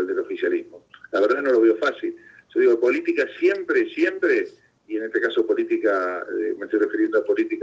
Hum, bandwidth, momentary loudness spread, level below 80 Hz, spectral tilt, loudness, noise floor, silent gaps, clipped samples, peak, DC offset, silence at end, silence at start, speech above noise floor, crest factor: none; 7.4 kHz; 10 LU; -72 dBFS; -5 dB/octave; -22 LUFS; -46 dBFS; none; under 0.1%; -8 dBFS; under 0.1%; 0 s; 0 s; 25 dB; 14 dB